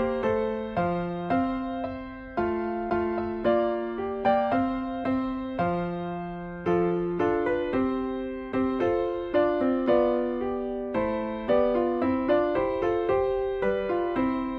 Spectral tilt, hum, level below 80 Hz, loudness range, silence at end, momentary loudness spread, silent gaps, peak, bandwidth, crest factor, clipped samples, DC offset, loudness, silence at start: -9 dB/octave; none; -50 dBFS; 3 LU; 0 s; 7 LU; none; -10 dBFS; 5.4 kHz; 16 dB; under 0.1%; under 0.1%; -27 LUFS; 0 s